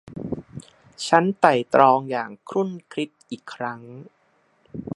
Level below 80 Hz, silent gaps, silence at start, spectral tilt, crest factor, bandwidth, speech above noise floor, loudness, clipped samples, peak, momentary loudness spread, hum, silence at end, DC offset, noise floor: -60 dBFS; none; 0.05 s; -5.5 dB/octave; 24 dB; 11.5 kHz; 41 dB; -22 LUFS; under 0.1%; 0 dBFS; 22 LU; none; 0 s; under 0.1%; -62 dBFS